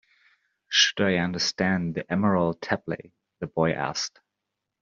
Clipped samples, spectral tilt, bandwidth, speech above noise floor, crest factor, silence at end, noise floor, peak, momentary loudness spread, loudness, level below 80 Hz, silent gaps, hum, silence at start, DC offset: under 0.1%; -3 dB/octave; 7.4 kHz; 58 dB; 22 dB; 0.75 s; -84 dBFS; -6 dBFS; 13 LU; -25 LUFS; -62 dBFS; none; none; 0.7 s; under 0.1%